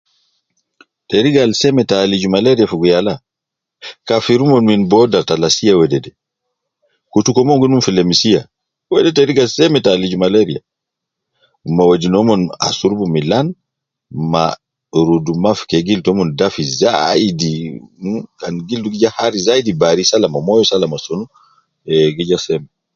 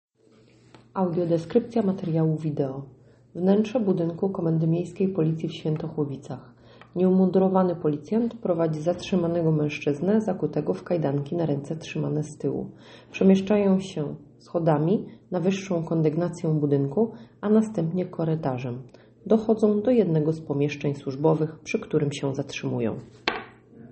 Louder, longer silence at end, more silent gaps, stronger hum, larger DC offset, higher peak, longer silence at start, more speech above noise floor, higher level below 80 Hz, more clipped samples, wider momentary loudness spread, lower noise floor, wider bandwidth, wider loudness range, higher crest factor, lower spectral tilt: first, -14 LUFS vs -25 LUFS; first, 0.3 s vs 0.05 s; neither; neither; neither; about the same, 0 dBFS vs -2 dBFS; first, 1.1 s vs 0.95 s; first, 69 dB vs 33 dB; first, -48 dBFS vs -62 dBFS; neither; about the same, 12 LU vs 10 LU; first, -82 dBFS vs -57 dBFS; second, 7.6 kHz vs 8.4 kHz; about the same, 3 LU vs 3 LU; second, 14 dB vs 22 dB; second, -5 dB/octave vs -8 dB/octave